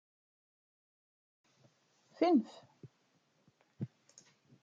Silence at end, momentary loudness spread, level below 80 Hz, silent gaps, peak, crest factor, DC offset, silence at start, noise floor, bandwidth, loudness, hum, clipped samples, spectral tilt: 0.75 s; 20 LU; under -90 dBFS; none; -18 dBFS; 22 dB; under 0.1%; 2.2 s; -75 dBFS; 7.6 kHz; -34 LUFS; none; under 0.1%; -7 dB/octave